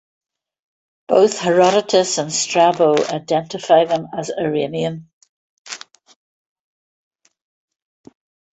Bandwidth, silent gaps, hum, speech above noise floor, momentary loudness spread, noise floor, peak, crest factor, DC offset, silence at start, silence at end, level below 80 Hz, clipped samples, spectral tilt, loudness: 8.4 kHz; 5.13-5.21 s, 5.29-5.65 s; none; 20 dB; 15 LU; -36 dBFS; -2 dBFS; 18 dB; under 0.1%; 1.1 s; 2.8 s; -64 dBFS; under 0.1%; -4 dB/octave; -17 LUFS